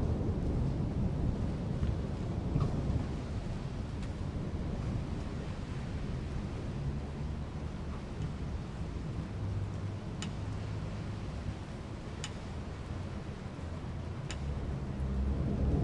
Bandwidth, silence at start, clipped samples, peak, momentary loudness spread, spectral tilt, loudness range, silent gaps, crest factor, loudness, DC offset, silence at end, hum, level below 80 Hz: 11 kHz; 0 s; under 0.1%; -18 dBFS; 8 LU; -7.5 dB/octave; 6 LU; none; 18 dB; -38 LUFS; under 0.1%; 0 s; none; -42 dBFS